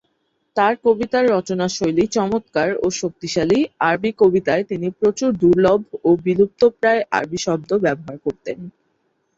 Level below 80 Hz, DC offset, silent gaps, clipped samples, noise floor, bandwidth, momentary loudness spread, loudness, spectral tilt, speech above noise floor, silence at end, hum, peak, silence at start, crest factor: -52 dBFS; under 0.1%; none; under 0.1%; -68 dBFS; 7.8 kHz; 10 LU; -18 LUFS; -5.5 dB/octave; 50 dB; 0.65 s; none; -2 dBFS; 0.55 s; 16 dB